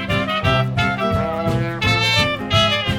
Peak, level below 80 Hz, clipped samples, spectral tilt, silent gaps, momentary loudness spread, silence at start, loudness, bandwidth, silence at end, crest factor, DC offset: -2 dBFS; -36 dBFS; under 0.1%; -5 dB/octave; none; 5 LU; 0 s; -18 LUFS; 16.5 kHz; 0 s; 16 dB; under 0.1%